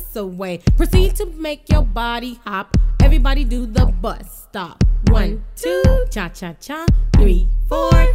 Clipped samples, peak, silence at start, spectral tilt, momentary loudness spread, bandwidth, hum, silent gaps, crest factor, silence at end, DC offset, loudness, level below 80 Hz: under 0.1%; 0 dBFS; 0 s; -6.5 dB/octave; 12 LU; 16 kHz; none; none; 14 dB; 0 s; under 0.1%; -18 LUFS; -16 dBFS